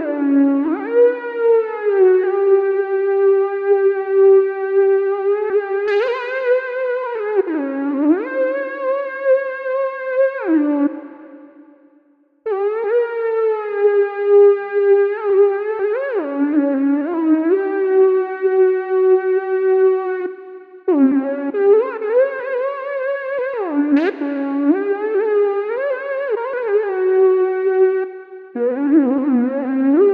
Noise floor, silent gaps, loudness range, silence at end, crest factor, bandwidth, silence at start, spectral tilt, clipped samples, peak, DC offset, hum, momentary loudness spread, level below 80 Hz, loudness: -55 dBFS; none; 4 LU; 0 s; 12 dB; 4.7 kHz; 0 s; -7.5 dB/octave; under 0.1%; -4 dBFS; under 0.1%; none; 8 LU; -78 dBFS; -17 LUFS